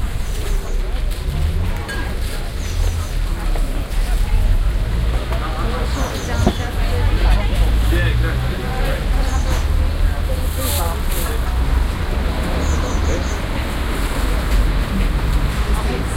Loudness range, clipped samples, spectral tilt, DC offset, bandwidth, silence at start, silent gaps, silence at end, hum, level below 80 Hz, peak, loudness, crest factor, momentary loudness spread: 4 LU; under 0.1%; -5.5 dB/octave; under 0.1%; 16.5 kHz; 0 s; none; 0 s; none; -18 dBFS; 0 dBFS; -21 LUFS; 16 dB; 6 LU